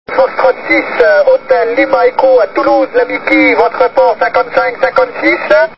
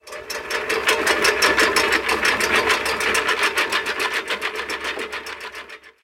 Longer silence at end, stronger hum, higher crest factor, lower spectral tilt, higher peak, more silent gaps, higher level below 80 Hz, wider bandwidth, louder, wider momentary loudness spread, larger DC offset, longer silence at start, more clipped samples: about the same, 0.05 s vs 0.15 s; neither; second, 10 dB vs 20 dB; first, -6 dB/octave vs -1 dB/octave; about the same, 0 dBFS vs -2 dBFS; neither; about the same, -48 dBFS vs -50 dBFS; second, 5.8 kHz vs 17 kHz; first, -10 LUFS vs -19 LUFS; second, 4 LU vs 14 LU; first, 1% vs under 0.1%; about the same, 0.1 s vs 0.05 s; first, 0.4% vs under 0.1%